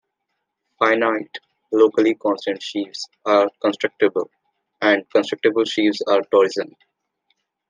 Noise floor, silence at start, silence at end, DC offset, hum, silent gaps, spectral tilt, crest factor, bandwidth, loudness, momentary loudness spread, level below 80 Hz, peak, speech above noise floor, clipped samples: -77 dBFS; 0.8 s; 1.05 s; under 0.1%; none; none; -4 dB/octave; 20 dB; 9.4 kHz; -19 LUFS; 11 LU; -76 dBFS; -2 dBFS; 58 dB; under 0.1%